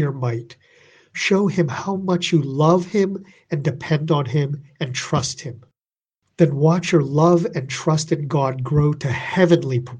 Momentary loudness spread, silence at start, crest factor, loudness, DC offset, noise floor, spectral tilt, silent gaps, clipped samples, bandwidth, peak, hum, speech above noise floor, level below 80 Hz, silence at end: 10 LU; 0 s; 18 dB; -20 LUFS; under 0.1%; under -90 dBFS; -6 dB/octave; none; under 0.1%; 9.6 kHz; -2 dBFS; none; over 71 dB; -52 dBFS; 0 s